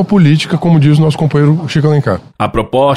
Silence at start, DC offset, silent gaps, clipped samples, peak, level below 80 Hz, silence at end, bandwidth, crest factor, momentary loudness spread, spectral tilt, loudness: 0 s; under 0.1%; none; under 0.1%; 0 dBFS; -36 dBFS; 0 s; 11 kHz; 10 dB; 7 LU; -7.5 dB/octave; -11 LUFS